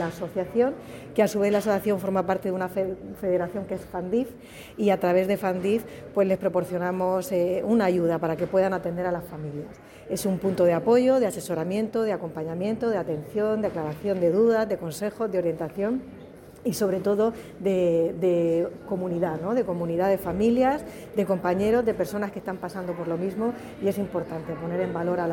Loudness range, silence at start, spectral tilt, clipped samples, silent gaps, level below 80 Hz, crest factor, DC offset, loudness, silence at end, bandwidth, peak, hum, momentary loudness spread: 3 LU; 0 s; -6.5 dB/octave; under 0.1%; none; -56 dBFS; 16 dB; under 0.1%; -26 LUFS; 0 s; 17 kHz; -8 dBFS; none; 10 LU